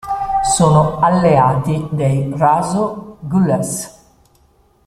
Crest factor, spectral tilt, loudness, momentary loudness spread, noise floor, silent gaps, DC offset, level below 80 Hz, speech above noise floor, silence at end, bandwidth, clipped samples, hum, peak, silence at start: 14 dB; -6 dB/octave; -15 LUFS; 11 LU; -54 dBFS; none; under 0.1%; -42 dBFS; 39 dB; 0.95 s; 14.5 kHz; under 0.1%; none; -2 dBFS; 0.05 s